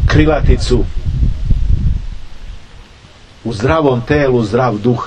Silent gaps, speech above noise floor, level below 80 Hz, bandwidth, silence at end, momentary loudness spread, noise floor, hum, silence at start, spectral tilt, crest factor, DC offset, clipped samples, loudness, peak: none; 28 dB; -18 dBFS; 9.4 kHz; 0 s; 20 LU; -39 dBFS; none; 0 s; -7 dB/octave; 14 dB; under 0.1%; 0.2%; -14 LUFS; 0 dBFS